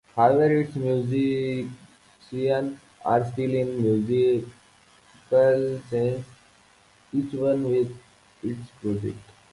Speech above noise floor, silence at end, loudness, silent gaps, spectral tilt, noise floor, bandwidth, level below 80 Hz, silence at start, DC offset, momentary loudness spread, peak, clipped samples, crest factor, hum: 34 dB; 0.3 s; -25 LUFS; none; -8.5 dB/octave; -57 dBFS; 11.5 kHz; -60 dBFS; 0.15 s; under 0.1%; 14 LU; -6 dBFS; under 0.1%; 20 dB; none